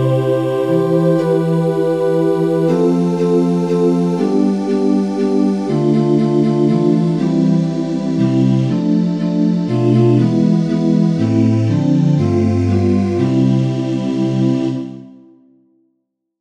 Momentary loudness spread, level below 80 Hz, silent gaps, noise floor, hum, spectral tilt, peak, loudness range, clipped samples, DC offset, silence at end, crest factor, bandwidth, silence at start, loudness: 3 LU; -60 dBFS; none; -70 dBFS; none; -9 dB/octave; -2 dBFS; 2 LU; under 0.1%; 0.3%; 1.3 s; 12 dB; 10.5 kHz; 0 s; -15 LUFS